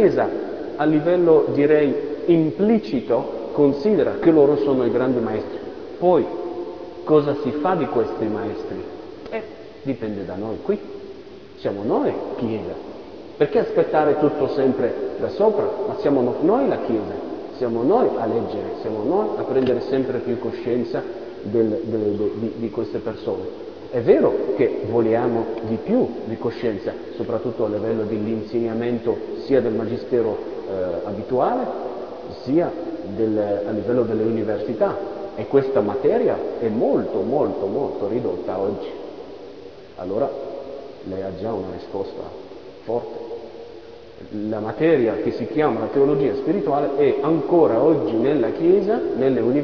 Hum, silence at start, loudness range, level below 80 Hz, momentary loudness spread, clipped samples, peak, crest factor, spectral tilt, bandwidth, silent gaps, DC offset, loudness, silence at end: none; 0 s; 9 LU; -54 dBFS; 15 LU; under 0.1%; -2 dBFS; 18 dB; -9 dB/octave; 5.4 kHz; none; 0.4%; -21 LUFS; 0 s